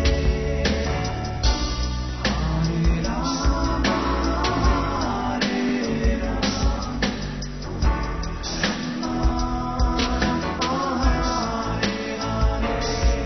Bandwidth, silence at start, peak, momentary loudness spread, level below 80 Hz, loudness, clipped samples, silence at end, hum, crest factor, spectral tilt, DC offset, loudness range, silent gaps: 6.4 kHz; 0 s; -8 dBFS; 5 LU; -26 dBFS; -24 LUFS; under 0.1%; 0 s; none; 16 dB; -5 dB/octave; 0.3%; 3 LU; none